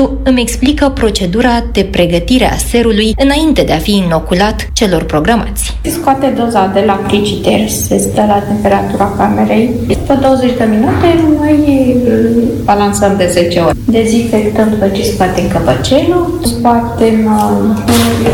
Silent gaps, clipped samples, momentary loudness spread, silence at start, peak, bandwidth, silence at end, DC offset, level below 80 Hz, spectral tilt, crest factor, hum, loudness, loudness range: none; 0.2%; 3 LU; 0 s; 0 dBFS; 18 kHz; 0 s; under 0.1%; -24 dBFS; -5.5 dB/octave; 10 dB; none; -10 LUFS; 2 LU